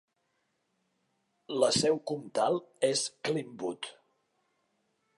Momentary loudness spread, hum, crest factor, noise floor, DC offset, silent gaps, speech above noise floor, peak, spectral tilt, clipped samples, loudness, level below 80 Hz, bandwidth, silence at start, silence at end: 12 LU; none; 22 dB; -78 dBFS; under 0.1%; none; 48 dB; -12 dBFS; -3.5 dB/octave; under 0.1%; -31 LUFS; -72 dBFS; 11.5 kHz; 1.5 s; 1.25 s